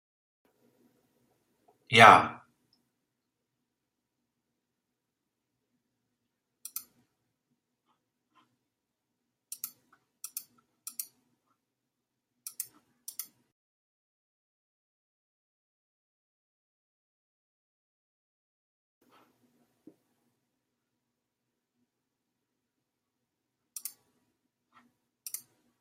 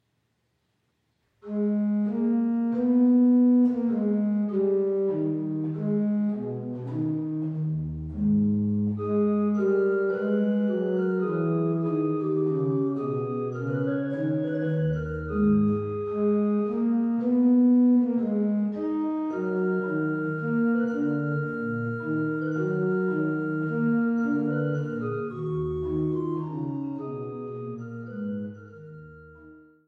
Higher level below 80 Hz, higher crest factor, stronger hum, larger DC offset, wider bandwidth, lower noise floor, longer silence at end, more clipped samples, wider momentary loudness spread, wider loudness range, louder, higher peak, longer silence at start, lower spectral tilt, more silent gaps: second, -80 dBFS vs -54 dBFS; first, 34 dB vs 12 dB; neither; neither; first, 16 kHz vs 3.5 kHz; first, -85 dBFS vs -74 dBFS; first, 13.2 s vs 0.3 s; neither; first, 30 LU vs 10 LU; first, 26 LU vs 6 LU; first, -19 LUFS vs -26 LUFS; first, -2 dBFS vs -14 dBFS; first, 1.9 s vs 1.45 s; second, -3 dB/octave vs -11 dB/octave; neither